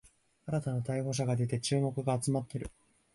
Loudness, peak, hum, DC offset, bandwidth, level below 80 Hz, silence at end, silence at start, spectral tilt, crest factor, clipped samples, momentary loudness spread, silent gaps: -33 LUFS; -18 dBFS; none; under 0.1%; 11.5 kHz; -58 dBFS; 0.45 s; 0.45 s; -6 dB/octave; 16 dB; under 0.1%; 10 LU; none